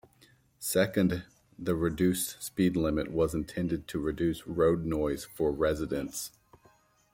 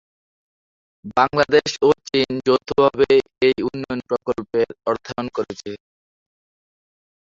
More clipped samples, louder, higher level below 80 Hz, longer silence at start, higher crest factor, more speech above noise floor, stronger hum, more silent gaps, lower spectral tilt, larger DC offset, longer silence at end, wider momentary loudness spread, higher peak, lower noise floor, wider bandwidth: neither; second, -30 LUFS vs -20 LUFS; about the same, -50 dBFS vs -54 dBFS; second, 0.6 s vs 1.05 s; about the same, 18 dB vs 18 dB; second, 35 dB vs over 71 dB; neither; neither; about the same, -5.5 dB/octave vs -5 dB/octave; neither; second, 0.85 s vs 1.45 s; second, 8 LU vs 11 LU; second, -12 dBFS vs -2 dBFS; second, -64 dBFS vs under -90 dBFS; first, 16.5 kHz vs 7.6 kHz